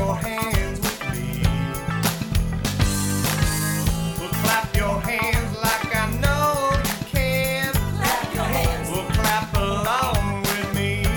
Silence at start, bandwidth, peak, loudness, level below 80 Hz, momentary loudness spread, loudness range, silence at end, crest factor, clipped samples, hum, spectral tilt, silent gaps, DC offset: 0 s; over 20 kHz; -4 dBFS; -22 LUFS; -30 dBFS; 4 LU; 1 LU; 0 s; 18 dB; under 0.1%; none; -4.5 dB/octave; none; under 0.1%